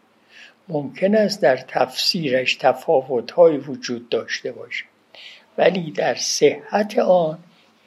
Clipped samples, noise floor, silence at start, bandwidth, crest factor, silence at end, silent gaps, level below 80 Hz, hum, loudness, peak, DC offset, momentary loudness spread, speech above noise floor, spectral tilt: under 0.1%; -48 dBFS; 0.4 s; 14.5 kHz; 20 dB; 0.5 s; none; -76 dBFS; none; -20 LUFS; 0 dBFS; under 0.1%; 13 LU; 29 dB; -4 dB/octave